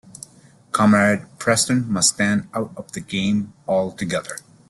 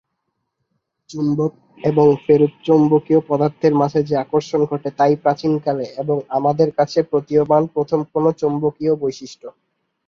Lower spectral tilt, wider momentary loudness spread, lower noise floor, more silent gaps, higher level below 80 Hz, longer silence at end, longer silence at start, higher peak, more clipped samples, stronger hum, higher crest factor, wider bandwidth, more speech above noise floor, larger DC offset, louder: second, -4 dB/octave vs -8 dB/octave; first, 14 LU vs 8 LU; second, -50 dBFS vs -74 dBFS; neither; about the same, -56 dBFS vs -58 dBFS; second, 0.3 s vs 0.6 s; second, 0.75 s vs 1.1 s; about the same, -4 dBFS vs -2 dBFS; neither; neither; about the same, 18 dB vs 16 dB; first, 12.5 kHz vs 7.2 kHz; second, 29 dB vs 57 dB; neither; about the same, -20 LUFS vs -18 LUFS